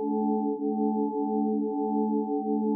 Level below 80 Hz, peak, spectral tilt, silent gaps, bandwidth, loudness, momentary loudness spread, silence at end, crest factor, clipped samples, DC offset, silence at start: -88 dBFS; -16 dBFS; -0.5 dB/octave; none; 1 kHz; -28 LUFS; 1 LU; 0 s; 12 dB; under 0.1%; under 0.1%; 0 s